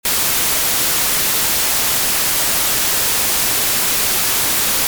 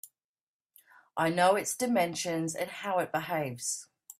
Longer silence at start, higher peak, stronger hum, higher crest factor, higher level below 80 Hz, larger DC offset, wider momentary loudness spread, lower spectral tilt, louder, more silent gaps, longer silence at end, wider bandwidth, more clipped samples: about the same, 0.05 s vs 0.05 s; first, -6 dBFS vs -14 dBFS; neither; second, 10 dB vs 18 dB; first, -42 dBFS vs -74 dBFS; neither; second, 0 LU vs 9 LU; second, 0 dB/octave vs -3.5 dB/octave; first, -13 LUFS vs -30 LUFS; second, none vs 0.24-0.35 s, 0.41-0.60 s; about the same, 0 s vs 0.1 s; first, over 20 kHz vs 16 kHz; neither